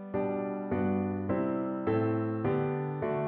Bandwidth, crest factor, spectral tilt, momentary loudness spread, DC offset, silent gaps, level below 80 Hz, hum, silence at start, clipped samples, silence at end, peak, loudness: 4.3 kHz; 14 dB; -8.5 dB/octave; 3 LU; under 0.1%; none; -62 dBFS; none; 0 s; under 0.1%; 0 s; -18 dBFS; -31 LUFS